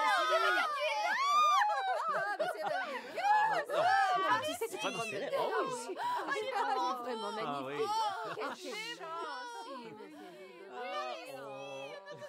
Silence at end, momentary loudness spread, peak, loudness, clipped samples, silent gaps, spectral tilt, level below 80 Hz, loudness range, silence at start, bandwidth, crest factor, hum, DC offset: 0 s; 16 LU; -18 dBFS; -33 LUFS; under 0.1%; none; -2 dB/octave; under -90 dBFS; 11 LU; 0 s; 16 kHz; 16 dB; none; under 0.1%